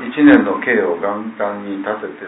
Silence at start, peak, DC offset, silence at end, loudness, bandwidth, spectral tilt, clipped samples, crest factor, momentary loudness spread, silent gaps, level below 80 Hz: 0 s; 0 dBFS; under 0.1%; 0 s; -16 LUFS; 4 kHz; -9.5 dB/octave; under 0.1%; 16 dB; 13 LU; none; -54 dBFS